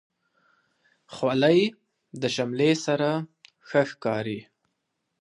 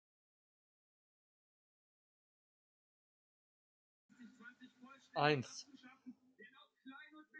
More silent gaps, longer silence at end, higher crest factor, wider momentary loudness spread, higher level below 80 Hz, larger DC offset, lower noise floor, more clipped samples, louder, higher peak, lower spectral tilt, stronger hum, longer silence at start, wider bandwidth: neither; first, 0.8 s vs 0 s; second, 20 dB vs 30 dB; second, 16 LU vs 26 LU; first, -72 dBFS vs under -90 dBFS; neither; first, -79 dBFS vs -65 dBFS; neither; first, -25 LUFS vs -39 LUFS; first, -6 dBFS vs -18 dBFS; first, -5.5 dB/octave vs -3.5 dB/octave; neither; second, 1.1 s vs 4.2 s; first, 11 kHz vs 7.6 kHz